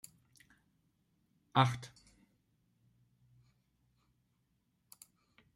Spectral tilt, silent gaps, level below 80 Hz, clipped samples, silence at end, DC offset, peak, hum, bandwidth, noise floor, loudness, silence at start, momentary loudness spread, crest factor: -5.5 dB/octave; none; -74 dBFS; under 0.1%; 3.7 s; under 0.1%; -14 dBFS; none; 16 kHz; -79 dBFS; -33 LUFS; 1.55 s; 27 LU; 30 dB